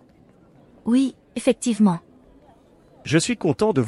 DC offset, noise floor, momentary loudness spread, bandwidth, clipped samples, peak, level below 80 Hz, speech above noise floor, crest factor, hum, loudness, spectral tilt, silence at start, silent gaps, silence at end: under 0.1%; -53 dBFS; 10 LU; 12 kHz; under 0.1%; -4 dBFS; -58 dBFS; 33 dB; 18 dB; none; -22 LUFS; -5.5 dB/octave; 0.85 s; none; 0 s